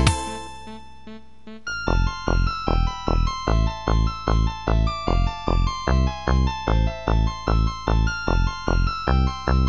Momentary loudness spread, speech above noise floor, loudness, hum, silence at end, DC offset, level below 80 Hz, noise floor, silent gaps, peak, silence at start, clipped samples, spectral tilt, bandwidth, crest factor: 13 LU; 23 dB; -23 LUFS; none; 0 s; 1%; -24 dBFS; -43 dBFS; none; 0 dBFS; 0 s; under 0.1%; -6 dB/octave; 11.5 kHz; 20 dB